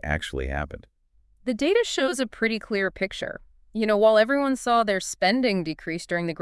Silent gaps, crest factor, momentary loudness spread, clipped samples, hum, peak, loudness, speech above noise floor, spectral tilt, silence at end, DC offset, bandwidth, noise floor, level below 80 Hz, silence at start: none; 18 dB; 14 LU; under 0.1%; none; -6 dBFS; -24 LUFS; 37 dB; -4.5 dB/octave; 0.05 s; under 0.1%; 12 kHz; -61 dBFS; -44 dBFS; 0.05 s